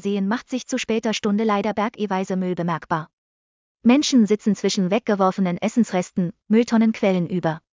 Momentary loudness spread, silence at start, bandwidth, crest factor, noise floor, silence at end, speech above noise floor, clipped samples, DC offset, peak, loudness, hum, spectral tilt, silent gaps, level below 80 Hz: 8 LU; 0.05 s; 7.6 kHz; 16 dB; under -90 dBFS; 0.15 s; over 69 dB; under 0.1%; under 0.1%; -4 dBFS; -21 LUFS; none; -5.5 dB/octave; 3.13-3.75 s; -62 dBFS